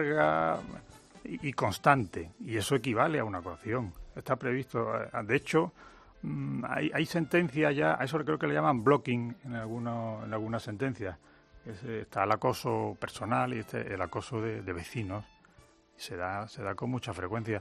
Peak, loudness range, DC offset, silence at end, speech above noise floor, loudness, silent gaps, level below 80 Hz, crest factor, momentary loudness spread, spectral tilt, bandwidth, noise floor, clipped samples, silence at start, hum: -6 dBFS; 7 LU; under 0.1%; 0 s; 30 dB; -32 LUFS; none; -62 dBFS; 26 dB; 13 LU; -6 dB/octave; 14 kHz; -61 dBFS; under 0.1%; 0 s; none